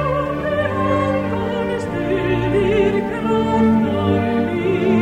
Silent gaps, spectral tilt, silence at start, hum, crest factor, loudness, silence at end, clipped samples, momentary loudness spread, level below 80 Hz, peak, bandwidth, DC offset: none; -8 dB/octave; 0 s; none; 12 dB; -18 LUFS; 0 s; under 0.1%; 5 LU; -38 dBFS; -6 dBFS; 10 kHz; under 0.1%